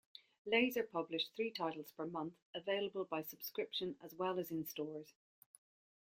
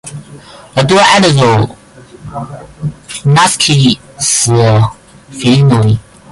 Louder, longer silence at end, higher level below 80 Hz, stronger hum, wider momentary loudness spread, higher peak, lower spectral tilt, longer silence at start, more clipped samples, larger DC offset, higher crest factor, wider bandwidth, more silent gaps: second, -41 LUFS vs -9 LUFS; first, 0.95 s vs 0.3 s; second, -84 dBFS vs -38 dBFS; neither; second, 11 LU vs 18 LU; second, -18 dBFS vs 0 dBFS; about the same, -4.5 dB/octave vs -4.5 dB/octave; first, 0.45 s vs 0.05 s; neither; neither; first, 24 dB vs 10 dB; first, 16.5 kHz vs 11.5 kHz; first, 2.42-2.53 s vs none